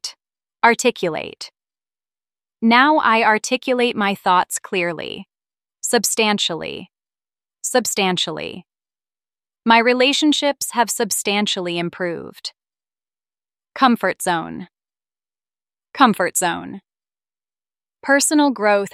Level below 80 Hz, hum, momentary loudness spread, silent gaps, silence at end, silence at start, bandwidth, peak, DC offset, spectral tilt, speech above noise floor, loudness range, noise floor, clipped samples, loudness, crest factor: -66 dBFS; none; 17 LU; none; 0.05 s; 0.05 s; 16 kHz; 0 dBFS; under 0.1%; -2.5 dB/octave; over 72 dB; 6 LU; under -90 dBFS; under 0.1%; -18 LUFS; 20 dB